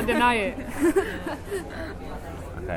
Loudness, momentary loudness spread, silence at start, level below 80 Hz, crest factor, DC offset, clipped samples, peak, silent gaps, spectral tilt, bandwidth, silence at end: -26 LUFS; 16 LU; 0 s; -42 dBFS; 18 dB; under 0.1%; under 0.1%; -8 dBFS; none; -5 dB/octave; 17.5 kHz; 0 s